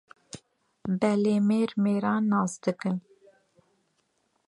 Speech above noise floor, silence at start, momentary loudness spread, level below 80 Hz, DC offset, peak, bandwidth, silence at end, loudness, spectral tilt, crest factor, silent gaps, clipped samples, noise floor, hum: 48 dB; 0.35 s; 22 LU; -70 dBFS; under 0.1%; -10 dBFS; 11 kHz; 1.5 s; -26 LUFS; -7 dB/octave; 18 dB; none; under 0.1%; -73 dBFS; none